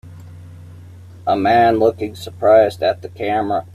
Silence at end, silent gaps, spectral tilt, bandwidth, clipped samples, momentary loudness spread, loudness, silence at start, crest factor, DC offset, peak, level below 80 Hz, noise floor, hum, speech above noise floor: 0.1 s; none; -6.5 dB/octave; 14.5 kHz; under 0.1%; 13 LU; -16 LUFS; 0.05 s; 16 dB; under 0.1%; -2 dBFS; -56 dBFS; -38 dBFS; none; 22 dB